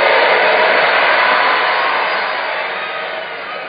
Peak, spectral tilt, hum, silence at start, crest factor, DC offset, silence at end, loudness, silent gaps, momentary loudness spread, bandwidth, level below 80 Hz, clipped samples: 0 dBFS; -5 dB/octave; none; 0 s; 14 dB; under 0.1%; 0 s; -13 LUFS; none; 11 LU; 5.2 kHz; -68 dBFS; under 0.1%